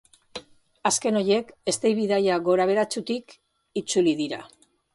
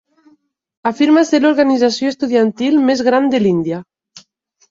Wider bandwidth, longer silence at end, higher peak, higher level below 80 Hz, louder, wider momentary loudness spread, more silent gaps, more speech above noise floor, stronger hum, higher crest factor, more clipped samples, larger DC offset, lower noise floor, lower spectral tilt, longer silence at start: first, 11.5 kHz vs 7.8 kHz; about the same, 0.5 s vs 0.5 s; second, -10 dBFS vs -2 dBFS; second, -68 dBFS vs -58 dBFS; second, -24 LUFS vs -14 LUFS; first, 15 LU vs 10 LU; neither; second, 20 dB vs 42 dB; neither; about the same, 16 dB vs 14 dB; neither; neither; second, -43 dBFS vs -56 dBFS; second, -4 dB/octave vs -5.5 dB/octave; second, 0.35 s vs 0.85 s